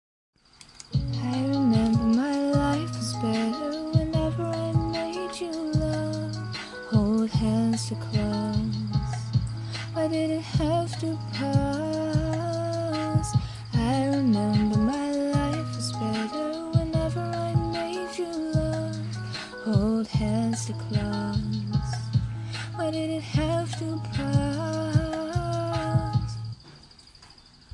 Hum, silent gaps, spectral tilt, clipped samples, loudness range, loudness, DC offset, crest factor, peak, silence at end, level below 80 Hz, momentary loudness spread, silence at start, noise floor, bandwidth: none; none; -6.5 dB/octave; under 0.1%; 3 LU; -27 LUFS; under 0.1%; 18 dB; -8 dBFS; 0.45 s; -42 dBFS; 8 LU; 0.6 s; -52 dBFS; 11.5 kHz